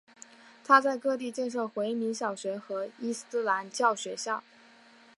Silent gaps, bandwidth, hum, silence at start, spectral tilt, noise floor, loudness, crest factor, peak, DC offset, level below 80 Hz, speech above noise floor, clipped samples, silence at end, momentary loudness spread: none; 11.5 kHz; none; 0.65 s; -3 dB/octave; -57 dBFS; -30 LUFS; 24 dB; -6 dBFS; under 0.1%; -88 dBFS; 28 dB; under 0.1%; 0.75 s; 13 LU